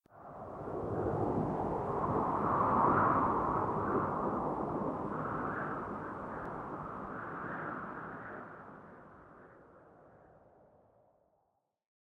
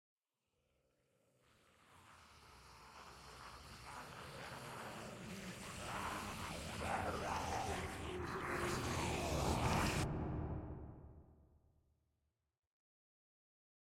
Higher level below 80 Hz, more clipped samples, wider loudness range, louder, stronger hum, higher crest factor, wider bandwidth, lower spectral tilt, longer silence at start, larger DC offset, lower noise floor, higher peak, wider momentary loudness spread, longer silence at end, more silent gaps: about the same, -58 dBFS vs -58 dBFS; neither; second, 16 LU vs 19 LU; first, -35 LUFS vs -43 LUFS; neither; about the same, 20 dB vs 22 dB; second, 10.5 kHz vs 16.5 kHz; first, -9.5 dB/octave vs -4.5 dB/octave; second, 0.15 s vs 1.9 s; neither; second, -80 dBFS vs -88 dBFS; first, -16 dBFS vs -24 dBFS; about the same, 20 LU vs 21 LU; second, 1.95 s vs 2.5 s; neither